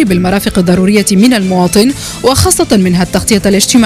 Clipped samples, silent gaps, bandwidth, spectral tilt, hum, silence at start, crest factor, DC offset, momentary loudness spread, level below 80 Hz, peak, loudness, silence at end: 0.7%; none; 16 kHz; -4.5 dB/octave; none; 0 s; 8 dB; under 0.1%; 3 LU; -30 dBFS; 0 dBFS; -9 LUFS; 0 s